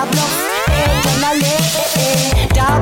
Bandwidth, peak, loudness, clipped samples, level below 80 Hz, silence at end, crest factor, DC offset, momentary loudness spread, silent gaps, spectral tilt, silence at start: 17 kHz; -4 dBFS; -14 LUFS; under 0.1%; -22 dBFS; 0 s; 10 dB; under 0.1%; 2 LU; none; -4 dB/octave; 0 s